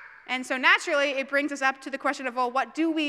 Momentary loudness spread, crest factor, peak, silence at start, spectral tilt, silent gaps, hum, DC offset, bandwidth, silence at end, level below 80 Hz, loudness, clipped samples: 9 LU; 20 dB; -8 dBFS; 0 s; -1 dB/octave; none; none; under 0.1%; 13.5 kHz; 0 s; -76 dBFS; -25 LUFS; under 0.1%